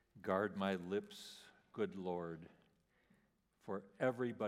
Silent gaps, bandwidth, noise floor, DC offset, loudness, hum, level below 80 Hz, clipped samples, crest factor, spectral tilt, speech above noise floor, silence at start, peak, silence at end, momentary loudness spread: none; 15.5 kHz; -77 dBFS; under 0.1%; -42 LUFS; none; -84 dBFS; under 0.1%; 20 dB; -6.5 dB/octave; 36 dB; 0.15 s; -24 dBFS; 0 s; 16 LU